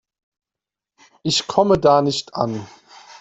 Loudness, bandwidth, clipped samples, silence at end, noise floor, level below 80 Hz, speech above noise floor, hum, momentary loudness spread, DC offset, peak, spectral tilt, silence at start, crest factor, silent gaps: -18 LUFS; 8.4 kHz; under 0.1%; 0.05 s; -88 dBFS; -50 dBFS; 70 dB; none; 12 LU; under 0.1%; -2 dBFS; -4.5 dB/octave; 1.25 s; 18 dB; none